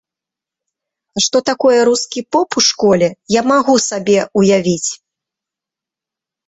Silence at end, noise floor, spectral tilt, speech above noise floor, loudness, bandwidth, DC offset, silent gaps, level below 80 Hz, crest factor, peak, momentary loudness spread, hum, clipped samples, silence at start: 1.55 s; -86 dBFS; -3.5 dB/octave; 73 dB; -14 LUFS; 8.4 kHz; under 0.1%; none; -56 dBFS; 14 dB; 0 dBFS; 6 LU; none; under 0.1%; 1.15 s